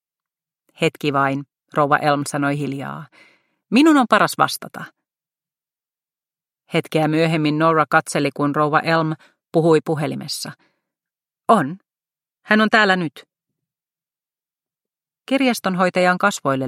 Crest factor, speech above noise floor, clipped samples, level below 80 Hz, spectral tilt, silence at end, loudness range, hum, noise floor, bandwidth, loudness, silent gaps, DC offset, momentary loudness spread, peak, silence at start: 20 dB; over 72 dB; under 0.1%; -68 dBFS; -5 dB/octave; 0 s; 4 LU; none; under -90 dBFS; 16 kHz; -18 LUFS; none; under 0.1%; 14 LU; 0 dBFS; 0.8 s